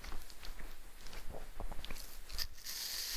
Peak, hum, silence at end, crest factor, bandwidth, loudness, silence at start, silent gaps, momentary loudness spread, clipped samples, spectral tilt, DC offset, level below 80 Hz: -22 dBFS; none; 0 s; 18 dB; 16 kHz; -46 LUFS; 0 s; none; 13 LU; under 0.1%; -1 dB/octave; under 0.1%; -50 dBFS